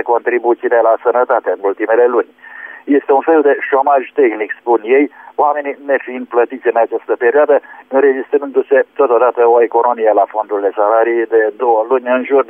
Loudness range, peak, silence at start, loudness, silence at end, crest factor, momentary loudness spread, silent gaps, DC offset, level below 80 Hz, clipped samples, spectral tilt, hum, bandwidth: 2 LU; -2 dBFS; 0 s; -13 LUFS; 0.05 s; 12 dB; 6 LU; none; under 0.1%; -68 dBFS; under 0.1%; -7.5 dB/octave; none; 3.5 kHz